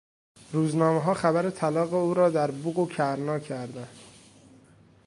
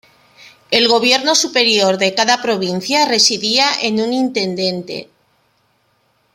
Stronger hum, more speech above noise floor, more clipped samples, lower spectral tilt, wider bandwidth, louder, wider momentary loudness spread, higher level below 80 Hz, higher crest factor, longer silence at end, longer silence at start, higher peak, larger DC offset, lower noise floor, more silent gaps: neither; second, 31 dB vs 45 dB; neither; first, -7 dB/octave vs -2 dB/octave; second, 11.5 kHz vs 16.5 kHz; second, -26 LUFS vs -14 LUFS; first, 13 LU vs 8 LU; second, -68 dBFS vs -62 dBFS; about the same, 20 dB vs 16 dB; second, 1 s vs 1.3 s; second, 0.5 s vs 0.7 s; second, -8 dBFS vs 0 dBFS; neither; second, -56 dBFS vs -61 dBFS; neither